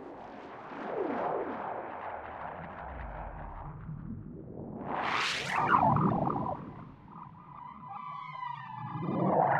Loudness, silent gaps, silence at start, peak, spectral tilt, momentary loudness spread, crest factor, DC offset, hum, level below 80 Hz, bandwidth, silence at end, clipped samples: -34 LUFS; none; 0 s; -12 dBFS; -6 dB/octave; 19 LU; 22 dB; under 0.1%; none; -54 dBFS; 12.5 kHz; 0 s; under 0.1%